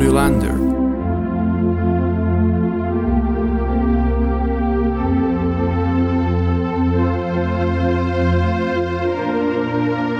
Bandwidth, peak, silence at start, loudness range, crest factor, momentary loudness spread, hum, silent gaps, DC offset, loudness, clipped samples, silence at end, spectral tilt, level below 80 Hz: 13 kHz; -2 dBFS; 0 s; 0 LU; 14 dB; 3 LU; none; none; under 0.1%; -18 LUFS; under 0.1%; 0 s; -8 dB/octave; -26 dBFS